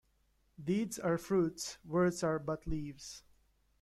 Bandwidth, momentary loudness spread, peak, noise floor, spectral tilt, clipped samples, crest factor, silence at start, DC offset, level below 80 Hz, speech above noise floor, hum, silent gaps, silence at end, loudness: 14 kHz; 14 LU; -20 dBFS; -74 dBFS; -5.5 dB/octave; under 0.1%; 16 dB; 0.6 s; under 0.1%; -56 dBFS; 39 dB; none; none; 0.6 s; -36 LUFS